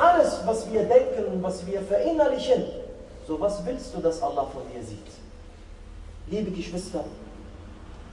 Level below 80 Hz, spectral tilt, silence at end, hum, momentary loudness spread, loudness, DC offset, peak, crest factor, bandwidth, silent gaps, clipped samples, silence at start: -46 dBFS; -5.5 dB/octave; 0 s; none; 24 LU; -26 LUFS; under 0.1%; -6 dBFS; 20 dB; 11.5 kHz; none; under 0.1%; 0 s